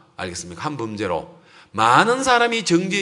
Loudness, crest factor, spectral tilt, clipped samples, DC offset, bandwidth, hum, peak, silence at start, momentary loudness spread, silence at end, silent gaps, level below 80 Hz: -19 LUFS; 20 dB; -4 dB/octave; under 0.1%; under 0.1%; 11 kHz; none; 0 dBFS; 0.2 s; 14 LU; 0 s; none; -58 dBFS